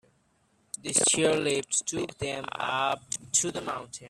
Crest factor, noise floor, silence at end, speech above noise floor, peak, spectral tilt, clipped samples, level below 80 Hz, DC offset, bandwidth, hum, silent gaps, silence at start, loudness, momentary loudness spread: 22 dB; -68 dBFS; 0 s; 39 dB; -8 dBFS; -2 dB/octave; under 0.1%; -64 dBFS; under 0.1%; 14.5 kHz; none; none; 0.85 s; -27 LUFS; 12 LU